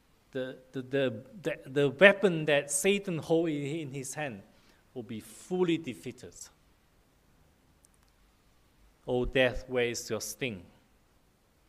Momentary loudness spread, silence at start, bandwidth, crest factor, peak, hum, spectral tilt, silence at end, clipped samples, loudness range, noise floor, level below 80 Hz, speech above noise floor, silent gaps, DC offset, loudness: 19 LU; 0.35 s; 15.5 kHz; 28 dB; -4 dBFS; none; -4 dB/octave; 1.05 s; under 0.1%; 11 LU; -67 dBFS; -54 dBFS; 37 dB; none; under 0.1%; -30 LUFS